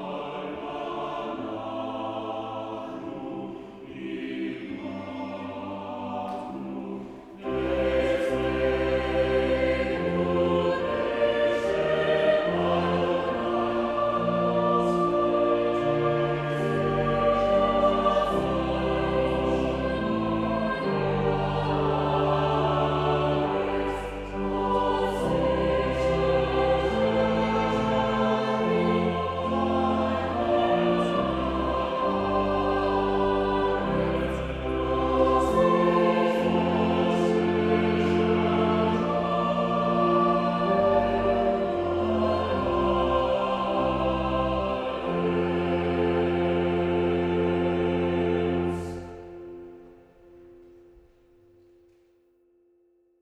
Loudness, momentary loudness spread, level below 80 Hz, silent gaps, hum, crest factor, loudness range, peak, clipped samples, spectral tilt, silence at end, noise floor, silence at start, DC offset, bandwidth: -25 LUFS; 11 LU; -42 dBFS; none; none; 16 dB; 10 LU; -10 dBFS; under 0.1%; -7.5 dB/octave; 2.65 s; -65 dBFS; 0 s; under 0.1%; 11 kHz